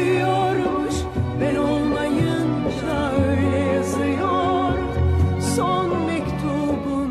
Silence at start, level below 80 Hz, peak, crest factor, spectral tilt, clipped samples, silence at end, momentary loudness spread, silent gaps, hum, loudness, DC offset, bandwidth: 0 s; -34 dBFS; -6 dBFS; 14 dB; -6.5 dB/octave; under 0.1%; 0 s; 4 LU; none; none; -21 LUFS; under 0.1%; 13.5 kHz